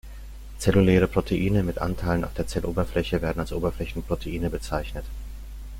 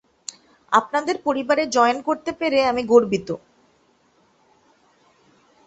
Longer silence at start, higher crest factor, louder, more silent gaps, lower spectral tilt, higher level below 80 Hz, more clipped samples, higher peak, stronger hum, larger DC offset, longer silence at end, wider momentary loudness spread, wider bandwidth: second, 0.05 s vs 0.7 s; about the same, 20 dB vs 20 dB; second, -26 LUFS vs -20 LUFS; neither; first, -7 dB/octave vs -4 dB/octave; first, -36 dBFS vs -60 dBFS; neither; second, -6 dBFS vs -2 dBFS; neither; neither; second, 0 s vs 2.3 s; first, 19 LU vs 16 LU; first, 16.5 kHz vs 8.2 kHz